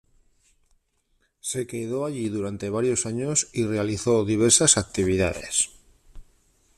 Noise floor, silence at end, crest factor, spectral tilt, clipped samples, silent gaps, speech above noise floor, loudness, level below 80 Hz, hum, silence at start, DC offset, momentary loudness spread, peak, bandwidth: -69 dBFS; 0.55 s; 24 dB; -3.5 dB/octave; under 0.1%; none; 45 dB; -23 LUFS; -52 dBFS; none; 1.45 s; under 0.1%; 12 LU; -2 dBFS; 14.5 kHz